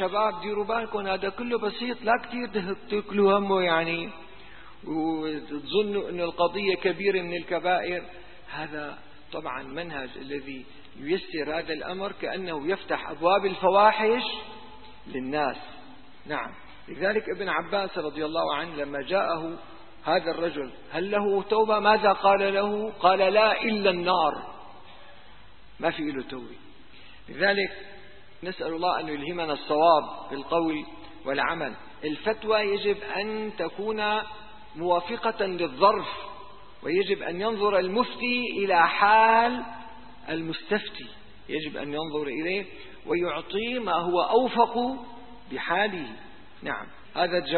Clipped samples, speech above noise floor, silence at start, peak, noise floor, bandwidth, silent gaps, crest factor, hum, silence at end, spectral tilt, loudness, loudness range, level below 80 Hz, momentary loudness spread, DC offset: under 0.1%; 26 dB; 0 s; -6 dBFS; -53 dBFS; 4.5 kHz; none; 22 dB; none; 0 s; -9 dB/octave; -26 LUFS; 8 LU; -58 dBFS; 18 LU; 0.6%